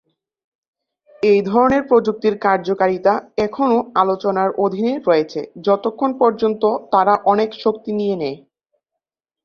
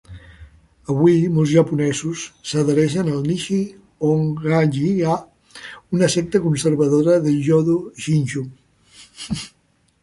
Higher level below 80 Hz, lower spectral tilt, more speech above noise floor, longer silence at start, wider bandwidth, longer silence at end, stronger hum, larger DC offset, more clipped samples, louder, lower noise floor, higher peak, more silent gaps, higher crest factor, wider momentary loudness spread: about the same, -56 dBFS vs -52 dBFS; about the same, -7 dB/octave vs -6.5 dB/octave; first, 66 dB vs 31 dB; first, 1.2 s vs 0.1 s; second, 6.8 kHz vs 11.5 kHz; first, 1.05 s vs 0.55 s; neither; neither; neither; about the same, -17 LUFS vs -19 LUFS; first, -83 dBFS vs -49 dBFS; about the same, -2 dBFS vs -2 dBFS; neither; about the same, 16 dB vs 16 dB; second, 7 LU vs 13 LU